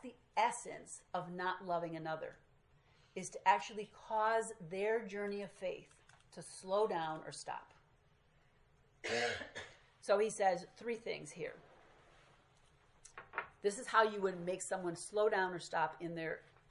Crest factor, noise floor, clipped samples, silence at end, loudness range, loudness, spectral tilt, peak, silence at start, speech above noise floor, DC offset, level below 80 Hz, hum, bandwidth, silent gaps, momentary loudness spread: 24 dB; -71 dBFS; under 0.1%; 0.3 s; 6 LU; -39 LUFS; -3.5 dB/octave; -16 dBFS; 0.05 s; 32 dB; under 0.1%; -76 dBFS; none; 11.5 kHz; none; 16 LU